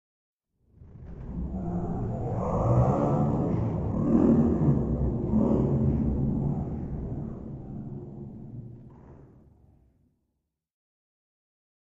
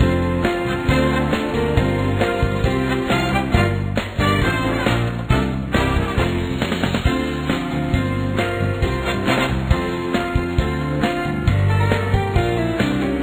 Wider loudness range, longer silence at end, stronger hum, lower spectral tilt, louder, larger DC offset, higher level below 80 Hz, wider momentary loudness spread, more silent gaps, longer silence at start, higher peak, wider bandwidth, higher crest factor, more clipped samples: first, 18 LU vs 2 LU; first, 2.65 s vs 0 s; neither; first, -11.5 dB/octave vs -6.5 dB/octave; second, -27 LUFS vs -20 LUFS; neither; second, -40 dBFS vs -28 dBFS; first, 19 LU vs 4 LU; neither; first, 0.8 s vs 0 s; second, -10 dBFS vs -2 dBFS; second, 7.6 kHz vs over 20 kHz; about the same, 18 dB vs 18 dB; neither